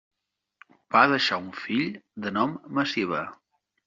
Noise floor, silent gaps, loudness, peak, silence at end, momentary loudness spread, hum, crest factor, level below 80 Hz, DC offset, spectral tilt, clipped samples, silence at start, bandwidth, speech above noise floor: -59 dBFS; none; -25 LUFS; -4 dBFS; 0.5 s; 12 LU; none; 24 dB; -70 dBFS; under 0.1%; -2 dB/octave; under 0.1%; 0.9 s; 7.6 kHz; 33 dB